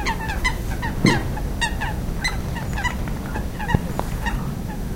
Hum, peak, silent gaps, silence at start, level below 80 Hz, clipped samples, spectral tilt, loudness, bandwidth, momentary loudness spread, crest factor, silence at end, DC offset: none; 0 dBFS; none; 0 s; -28 dBFS; under 0.1%; -5 dB/octave; -24 LUFS; 17 kHz; 8 LU; 22 dB; 0 s; under 0.1%